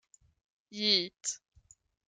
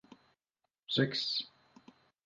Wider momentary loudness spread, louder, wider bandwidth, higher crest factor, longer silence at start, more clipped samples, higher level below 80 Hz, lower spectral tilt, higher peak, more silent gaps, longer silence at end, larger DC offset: about the same, 18 LU vs 18 LU; first, -30 LUFS vs -33 LUFS; first, 12 kHz vs 9.6 kHz; about the same, 24 dB vs 24 dB; first, 0.7 s vs 0.1 s; neither; first, -74 dBFS vs -82 dBFS; second, -1.5 dB/octave vs -5 dB/octave; first, -12 dBFS vs -16 dBFS; second, none vs 0.79-0.83 s; about the same, 0.75 s vs 0.8 s; neither